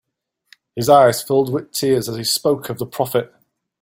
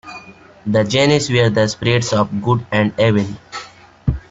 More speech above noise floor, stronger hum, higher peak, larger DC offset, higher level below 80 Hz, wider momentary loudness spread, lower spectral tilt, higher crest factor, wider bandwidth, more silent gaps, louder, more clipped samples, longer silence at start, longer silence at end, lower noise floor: first, 57 dB vs 23 dB; neither; about the same, 0 dBFS vs -2 dBFS; neither; second, -56 dBFS vs -38 dBFS; second, 12 LU vs 17 LU; about the same, -4.5 dB/octave vs -5.5 dB/octave; about the same, 18 dB vs 16 dB; first, 17 kHz vs 8 kHz; neither; about the same, -18 LUFS vs -16 LUFS; neither; first, 0.75 s vs 0.05 s; first, 0.55 s vs 0.1 s; first, -74 dBFS vs -39 dBFS